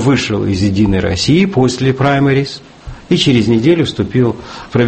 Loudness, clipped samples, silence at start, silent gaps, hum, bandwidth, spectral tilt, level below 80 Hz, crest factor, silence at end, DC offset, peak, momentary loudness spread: -13 LUFS; under 0.1%; 0 s; none; none; 8.8 kHz; -6 dB/octave; -36 dBFS; 12 dB; 0 s; under 0.1%; 0 dBFS; 6 LU